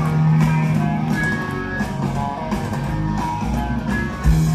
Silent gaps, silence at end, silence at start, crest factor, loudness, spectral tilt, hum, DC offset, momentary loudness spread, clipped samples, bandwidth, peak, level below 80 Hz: none; 0 s; 0 s; 16 dB; -21 LUFS; -7 dB/octave; none; under 0.1%; 7 LU; under 0.1%; 13.5 kHz; -4 dBFS; -28 dBFS